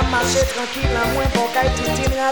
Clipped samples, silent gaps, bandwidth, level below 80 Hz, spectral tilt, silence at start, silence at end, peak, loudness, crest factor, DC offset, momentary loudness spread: under 0.1%; none; over 20 kHz; -26 dBFS; -4 dB/octave; 0 s; 0 s; -4 dBFS; -19 LUFS; 14 dB; 0.9%; 4 LU